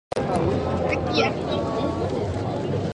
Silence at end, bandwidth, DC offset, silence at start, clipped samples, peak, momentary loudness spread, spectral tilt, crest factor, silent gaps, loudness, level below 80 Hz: 0 s; 11.5 kHz; under 0.1%; 0.15 s; under 0.1%; -6 dBFS; 4 LU; -6.5 dB/octave; 18 dB; none; -24 LUFS; -40 dBFS